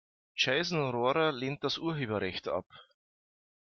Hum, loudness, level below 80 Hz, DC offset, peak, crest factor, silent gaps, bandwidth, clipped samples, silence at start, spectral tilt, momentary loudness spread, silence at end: none; -31 LUFS; -70 dBFS; under 0.1%; -16 dBFS; 18 dB; 2.66-2.70 s; 7.2 kHz; under 0.1%; 0.35 s; -5 dB/octave; 8 LU; 0.9 s